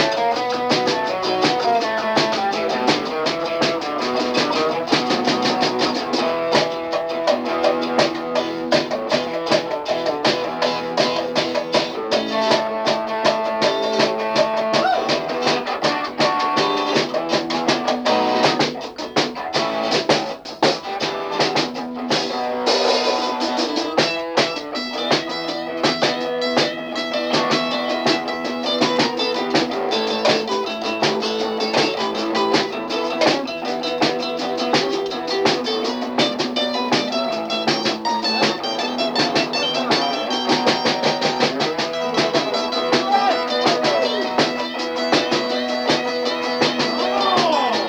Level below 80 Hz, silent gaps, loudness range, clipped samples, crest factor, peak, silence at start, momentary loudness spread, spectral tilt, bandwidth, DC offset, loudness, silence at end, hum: -60 dBFS; none; 2 LU; under 0.1%; 18 dB; -2 dBFS; 0 s; 5 LU; -3.5 dB/octave; over 20 kHz; under 0.1%; -19 LUFS; 0 s; none